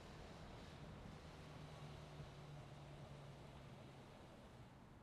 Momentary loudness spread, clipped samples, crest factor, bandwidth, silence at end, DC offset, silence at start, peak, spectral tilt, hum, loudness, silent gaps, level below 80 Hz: 5 LU; under 0.1%; 14 dB; 13 kHz; 0 s; under 0.1%; 0 s; -44 dBFS; -6 dB/octave; none; -58 LUFS; none; -66 dBFS